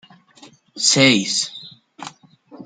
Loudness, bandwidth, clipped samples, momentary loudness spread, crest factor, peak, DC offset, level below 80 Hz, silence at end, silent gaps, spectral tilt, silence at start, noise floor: -16 LUFS; 9.6 kHz; under 0.1%; 24 LU; 20 dB; 0 dBFS; under 0.1%; -66 dBFS; 0 s; none; -2.5 dB/octave; 0.75 s; -48 dBFS